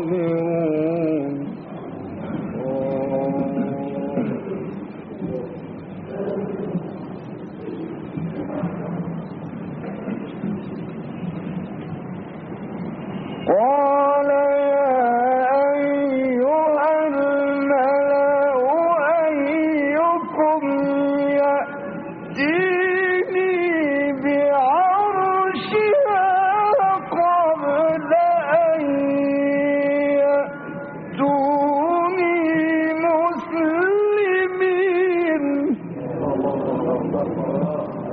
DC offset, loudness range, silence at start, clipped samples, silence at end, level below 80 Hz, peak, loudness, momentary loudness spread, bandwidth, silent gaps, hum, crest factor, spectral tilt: under 0.1%; 11 LU; 0 s; under 0.1%; 0 s; -60 dBFS; -6 dBFS; -20 LUFS; 14 LU; 4.9 kHz; none; none; 14 dB; -5.5 dB/octave